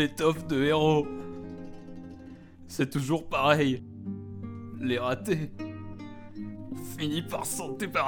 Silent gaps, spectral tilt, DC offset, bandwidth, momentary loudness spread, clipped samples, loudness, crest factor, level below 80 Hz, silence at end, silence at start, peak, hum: none; -5 dB/octave; under 0.1%; 19 kHz; 20 LU; under 0.1%; -29 LUFS; 22 dB; -56 dBFS; 0 s; 0 s; -8 dBFS; none